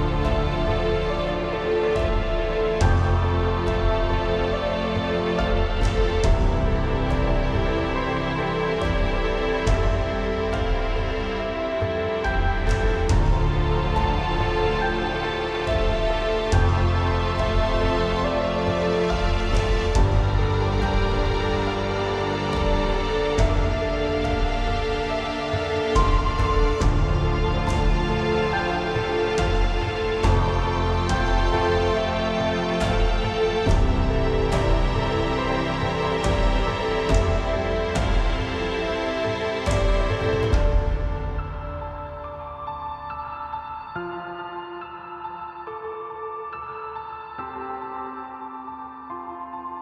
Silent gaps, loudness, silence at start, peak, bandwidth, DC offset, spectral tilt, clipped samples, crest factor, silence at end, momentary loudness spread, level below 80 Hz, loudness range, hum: none; -24 LUFS; 0 s; -6 dBFS; 9.8 kHz; under 0.1%; -6 dB/octave; under 0.1%; 16 dB; 0 s; 11 LU; -26 dBFS; 11 LU; none